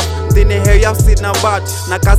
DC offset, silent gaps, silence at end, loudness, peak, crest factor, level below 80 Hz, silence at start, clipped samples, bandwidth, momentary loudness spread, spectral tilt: under 0.1%; none; 0 s; -13 LUFS; 0 dBFS; 10 dB; -12 dBFS; 0 s; 0.4%; 15.5 kHz; 5 LU; -5 dB/octave